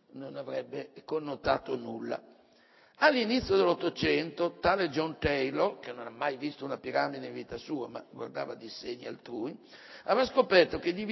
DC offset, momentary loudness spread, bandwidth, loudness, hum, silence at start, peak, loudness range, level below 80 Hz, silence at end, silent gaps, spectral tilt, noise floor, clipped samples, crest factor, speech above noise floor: under 0.1%; 16 LU; 6.2 kHz; -31 LUFS; none; 0.15 s; -8 dBFS; 8 LU; -56 dBFS; 0 s; none; -5.5 dB/octave; -62 dBFS; under 0.1%; 22 dB; 31 dB